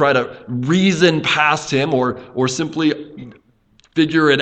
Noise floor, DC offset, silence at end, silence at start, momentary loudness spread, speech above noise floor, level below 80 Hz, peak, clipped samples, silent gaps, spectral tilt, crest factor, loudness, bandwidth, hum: -55 dBFS; under 0.1%; 0 s; 0 s; 11 LU; 39 dB; -54 dBFS; 0 dBFS; under 0.1%; none; -5 dB/octave; 18 dB; -17 LUFS; 8.8 kHz; none